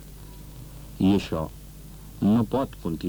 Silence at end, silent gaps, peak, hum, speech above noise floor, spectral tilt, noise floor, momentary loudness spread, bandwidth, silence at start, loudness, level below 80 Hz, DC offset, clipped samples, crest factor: 0 s; none; -12 dBFS; none; 19 dB; -7.5 dB/octave; -43 dBFS; 22 LU; over 20 kHz; 0 s; -25 LUFS; -44 dBFS; under 0.1%; under 0.1%; 16 dB